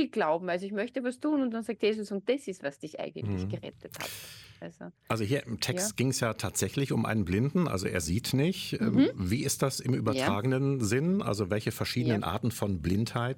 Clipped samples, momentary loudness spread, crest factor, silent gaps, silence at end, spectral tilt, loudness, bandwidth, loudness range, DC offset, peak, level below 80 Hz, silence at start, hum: under 0.1%; 10 LU; 18 dB; none; 0 s; -5.5 dB/octave; -30 LUFS; 17.5 kHz; 6 LU; under 0.1%; -12 dBFS; -56 dBFS; 0 s; none